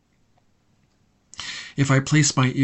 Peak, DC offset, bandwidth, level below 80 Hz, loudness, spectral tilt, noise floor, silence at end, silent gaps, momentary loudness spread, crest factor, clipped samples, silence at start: -6 dBFS; under 0.1%; 8.4 kHz; -58 dBFS; -21 LUFS; -4.5 dB/octave; -63 dBFS; 0 s; none; 17 LU; 18 dB; under 0.1%; 1.4 s